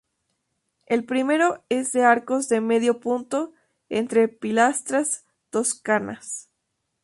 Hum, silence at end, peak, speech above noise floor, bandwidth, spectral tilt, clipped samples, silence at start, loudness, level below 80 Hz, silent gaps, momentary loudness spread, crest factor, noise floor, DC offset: none; 0.65 s; -4 dBFS; 55 dB; 11.5 kHz; -3.5 dB/octave; under 0.1%; 0.9 s; -23 LUFS; -70 dBFS; none; 11 LU; 20 dB; -77 dBFS; under 0.1%